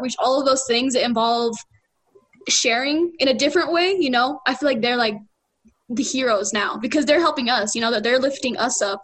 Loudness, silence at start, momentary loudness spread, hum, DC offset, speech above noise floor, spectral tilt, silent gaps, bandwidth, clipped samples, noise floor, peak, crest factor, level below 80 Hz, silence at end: -20 LUFS; 0 s; 5 LU; none; under 0.1%; 40 dB; -2 dB/octave; none; 9.6 kHz; under 0.1%; -60 dBFS; -4 dBFS; 16 dB; -62 dBFS; 0 s